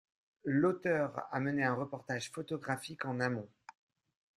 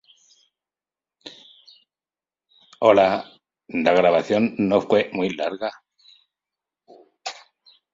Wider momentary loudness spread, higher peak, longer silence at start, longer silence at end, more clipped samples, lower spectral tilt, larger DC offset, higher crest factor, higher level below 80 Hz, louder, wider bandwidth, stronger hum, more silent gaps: second, 9 LU vs 25 LU; second, -18 dBFS vs -2 dBFS; second, 0.45 s vs 1.25 s; first, 0.9 s vs 0.6 s; neither; about the same, -6 dB/octave vs -6 dB/octave; neither; about the same, 18 dB vs 22 dB; second, -74 dBFS vs -62 dBFS; second, -36 LUFS vs -20 LUFS; first, 12.5 kHz vs 7.8 kHz; neither; neither